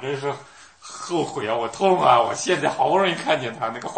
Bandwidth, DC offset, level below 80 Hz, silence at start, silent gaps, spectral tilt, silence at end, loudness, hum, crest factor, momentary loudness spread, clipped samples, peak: 8.8 kHz; under 0.1%; -64 dBFS; 0 s; none; -4 dB/octave; 0 s; -21 LUFS; none; 22 dB; 12 LU; under 0.1%; 0 dBFS